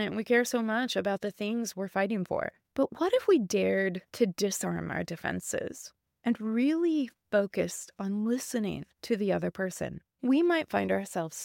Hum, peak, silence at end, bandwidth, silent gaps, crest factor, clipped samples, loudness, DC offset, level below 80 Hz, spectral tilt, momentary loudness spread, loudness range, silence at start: none; -12 dBFS; 0 s; 17 kHz; none; 16 dB; under 0.1%; -30 LUFS; under 0.1%; -66 dBFS; -5 dB/octave; 9 LU; 2 LU; 0 s